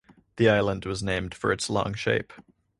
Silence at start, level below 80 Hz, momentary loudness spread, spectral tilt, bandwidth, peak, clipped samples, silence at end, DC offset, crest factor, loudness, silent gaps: 0.35 s; -48 dBFS; 8 LU; -5 dB/octave; 11.5 kHz; -6 dBFS; under 0.1%; 0.4 s; under 0.1%; 20 dB; -26 LUFS; none